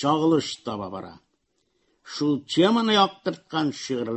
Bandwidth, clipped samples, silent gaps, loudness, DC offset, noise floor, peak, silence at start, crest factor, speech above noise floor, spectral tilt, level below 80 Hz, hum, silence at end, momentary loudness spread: 8.6 kHz; under 0.1%; none; -24 LUFS; under 0.1%; -72 dBFS; -6 dBFS; 0 s; 20 dB; 49 dB; -5 dB/octave; -64 dBFS; none; 0 s; 16 LU